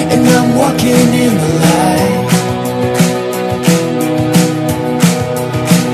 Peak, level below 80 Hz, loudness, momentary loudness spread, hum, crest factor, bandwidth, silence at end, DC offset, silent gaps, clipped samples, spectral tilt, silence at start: 0 dBFS; -40 dBFS; -11 LUFS; 6 LU; none; 10 dB; 14.5 kHz; 0 s; under 0.1%; none; 0.3%; -5.5 dB/octave; 0 s